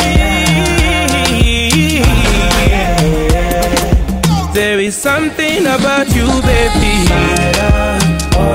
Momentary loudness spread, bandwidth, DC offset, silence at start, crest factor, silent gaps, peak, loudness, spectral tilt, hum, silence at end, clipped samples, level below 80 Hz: 2 LU; 16.5 kHz; under 0.1%; 0 s; 10 dB; none; 0 dBFS; -11 LUFS; -4.5 dB/octave; none; 0 s; under 0.1%; -16 dBFS